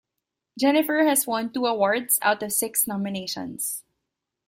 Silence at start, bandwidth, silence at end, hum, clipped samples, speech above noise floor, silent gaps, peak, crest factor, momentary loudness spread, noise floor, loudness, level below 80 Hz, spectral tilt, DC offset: 0.55 s; 16 kHz; 0.65 s; none; under 0.1%; 60 dB; none; -6 dBFS; 18 dB; 9 LU; -83 dBFS; -23 LUFS; -68 dBFS; -2.5 dB/octave; under 0.1%